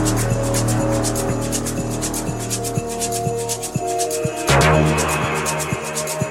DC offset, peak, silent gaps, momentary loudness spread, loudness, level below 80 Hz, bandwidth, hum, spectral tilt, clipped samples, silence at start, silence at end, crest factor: under 0.1%; -2 dBFS; none; 8 LU; -20 LUFS; -34 dBFS; 16.5 kHz; none; -4.5 dB/octave; under 0.1%; 0 s; 0 s; 18 dB